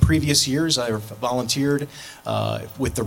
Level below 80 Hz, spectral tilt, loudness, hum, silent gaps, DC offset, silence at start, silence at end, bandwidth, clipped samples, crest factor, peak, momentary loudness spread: -36 dBFS; -4.5 dB/octave; -22 LUFS; none; none; under 0.1%; 0 s; 0 s; 17 kHz; under 0.1%; 20 dB; -2 dBFS; 10 LU